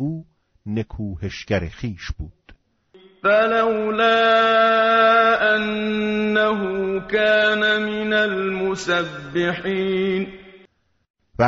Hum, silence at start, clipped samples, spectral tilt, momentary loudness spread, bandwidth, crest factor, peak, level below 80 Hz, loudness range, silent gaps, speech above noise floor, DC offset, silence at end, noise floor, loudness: none; 0 s; under 0.1%; -3 dB/octave; 15 LU; 7.6 kHz; 16 dB; -4 dBFS; -46 dBFS; 7 LU; 11.10-11.14 s; 38 dB; under 0.1%; 0 s; -57 dBFS; -19 LUFS